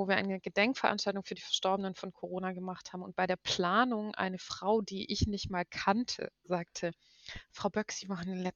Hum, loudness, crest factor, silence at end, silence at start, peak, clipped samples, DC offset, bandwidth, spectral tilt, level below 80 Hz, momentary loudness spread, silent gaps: none; -34 LUFS; 22 dB; 0.05 s; 0 s; -12 dBFS; under 0.1%; under 0.1%; 7.8 kHz; -4.5 dB/octave; -56 dBFS; 11 LU; none